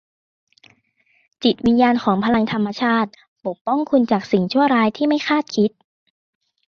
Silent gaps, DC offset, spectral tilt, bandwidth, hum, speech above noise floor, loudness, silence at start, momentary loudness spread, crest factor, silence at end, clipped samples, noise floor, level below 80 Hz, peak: 3.28-3.36 s, 3.61-3.65 s; under 0.1%; -6.5 dB/octave; 6.8 kHz; none; 45 dB; -18 LUFS; 1.4 s; 6 LU; 16 dB; 1 s; under 0.1%; -62 dBFS; -56 dBFS; -4 dBFS